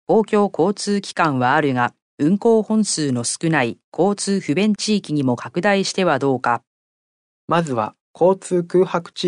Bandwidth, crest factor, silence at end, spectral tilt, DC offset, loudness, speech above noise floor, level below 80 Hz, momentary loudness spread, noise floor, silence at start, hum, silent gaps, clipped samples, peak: 10.5 kHz; 16 dB; 0 s; -5 dB/octave; under 0.1%; -19 LUFS; over 72 dB; -66 dBFS; 5 LU; under -90 dBFS; 0.1 s; none; 2.02-2.18 s, 3.84-3.92 s, 6.67-7.48 s, 8.01-8.14 s; under 0.1%; -4 dBFS